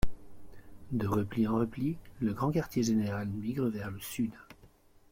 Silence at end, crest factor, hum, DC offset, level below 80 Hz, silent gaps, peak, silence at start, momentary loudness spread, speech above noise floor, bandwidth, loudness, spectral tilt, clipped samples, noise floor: 0.45 s; 18 dB; none; under 0.1%; -48 dBFS; none; -14 dBFS; 0 s; 8 LU; 28 dB; 16.5 kHz; -33 LUFS; -6.5 dB/octave; under 0.1%; -60 dBFS